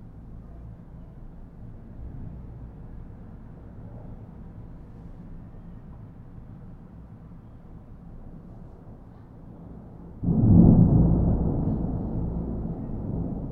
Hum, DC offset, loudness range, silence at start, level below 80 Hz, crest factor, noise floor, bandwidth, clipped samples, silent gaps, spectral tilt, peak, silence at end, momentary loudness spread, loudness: none; under 0.1%; 24 LU; 0 s; -36 dBFS; 24 dB; -45 dBFS; 1.9 kHz; under 0.1%; none; -14 dB/octave; -4 dBFS; 0 s; 26 LU; -23 LUFS